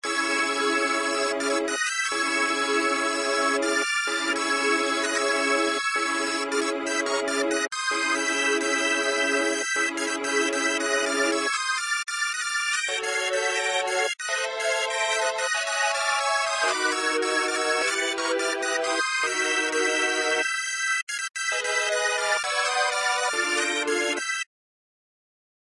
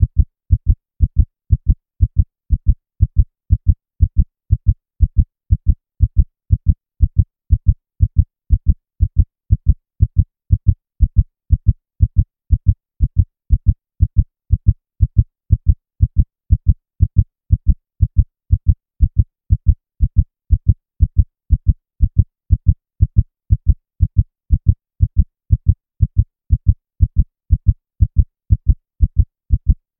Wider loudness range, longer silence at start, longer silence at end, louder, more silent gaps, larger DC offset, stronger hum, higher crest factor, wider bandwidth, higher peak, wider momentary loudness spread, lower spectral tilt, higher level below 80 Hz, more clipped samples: about the same, 1 LU vs 0 LU; about the same, 0.05 s vs 0 s; first, 1.25 s vs 0.25 s; second, -24 LUFS vs -19 LUFS; first, 21.03-21.07 s vs none; second, under 0.1% vs 0.4%; neither; about the same, 14 dB vs 16 dB; first, 11.5 kHz vs 0.5 kHz; second, -12 dBFS vs 0 dBFS; about the same, 3 LU vs 3 LU; second, 0.5 dB/octave vs -17.5 dB/octave; second, -72 dBFS vs -18 dBFS; neither